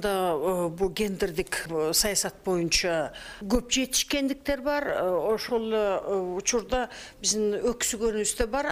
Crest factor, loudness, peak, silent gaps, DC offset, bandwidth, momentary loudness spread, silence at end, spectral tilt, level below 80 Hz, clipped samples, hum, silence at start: 18 dB; -27 LUFS; -10 dBFS; none; under 0.1%; 15.5 kHz; 6 LU; 0 s; -2.5 dB/octave; -44 dBFS; under 0.1%; none; 0 s